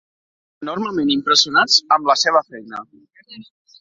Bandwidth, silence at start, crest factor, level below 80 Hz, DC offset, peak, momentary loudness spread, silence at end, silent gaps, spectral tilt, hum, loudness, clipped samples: 7.8 kHz; 0.6 s; 20 dB; -64 dBFS; under 0.1%; 0 dBFS; 19 LU; 0.4 s; none; -1.5 dB/octave; none; -15 LUFS; under 0.1%